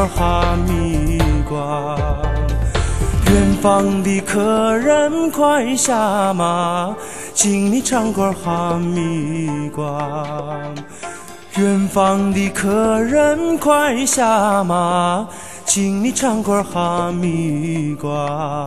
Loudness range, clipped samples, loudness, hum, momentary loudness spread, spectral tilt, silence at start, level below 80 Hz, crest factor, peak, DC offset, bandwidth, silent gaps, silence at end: 5 LU; under 0.1%; -17 LUFS; none; 9 LU; -5 dB/octave; 0 s; -28 dBFS; 16 dB; 0 dBFS; 1%; 13 kHz; none; 0 s